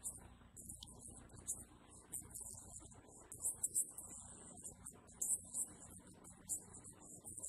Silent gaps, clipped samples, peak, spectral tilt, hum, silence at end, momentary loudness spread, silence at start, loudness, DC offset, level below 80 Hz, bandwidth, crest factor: none; under 0.1%; -24 dBFS; -2 dB/octave; none; 0 s; 18 LU; 0 s; -46 LUFS; under 0.1%; -68 dBFS; 15 kHz; 26 dB